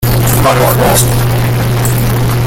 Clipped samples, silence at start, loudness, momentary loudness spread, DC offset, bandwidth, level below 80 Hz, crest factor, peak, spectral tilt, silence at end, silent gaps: under 0.1%; 0 s; -10 LUFS; 4 LU; under 0.1%; 17 kHz; -22 dBFS; 10 dB; 0 dBFS; -5 dB/octave; 0 s; none